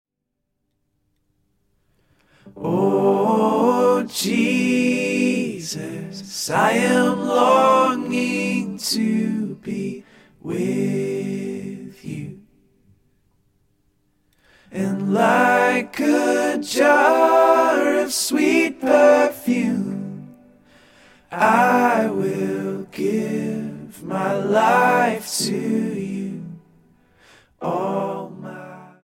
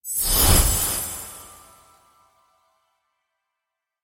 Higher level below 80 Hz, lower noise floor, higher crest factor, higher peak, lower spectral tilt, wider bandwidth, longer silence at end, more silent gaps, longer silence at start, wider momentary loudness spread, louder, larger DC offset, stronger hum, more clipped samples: second, -64 dBFS vs -30 dBFS; second, -78 dBFS vs -83 dBFS; about the same, 18 dB vs 22 dB; about the same, -2 dBFS vs -2 dBFS; first, -4.5 dB/octave vs -2.5 dB/octave; about the same, 16.5 kHz vs 17 kHz; second, 0.15 s vs 2.5 s; neither; first, 2.45 s vs 0.05 s; second, 17 LU vs 20 LU; about the same, -19 LUFS vs -19 LUFS; neither; neither; neither